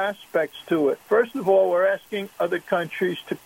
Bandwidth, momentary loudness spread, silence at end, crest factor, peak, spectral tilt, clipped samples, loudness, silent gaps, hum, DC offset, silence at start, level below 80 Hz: 16.5 kHz; 7 LU; 0.1 s; 16 dB; -8 dBFS; -6 dB/octave; under 0.1%; -23 LUFS; none; none; under 0.1%; 0 s; -72 dBFS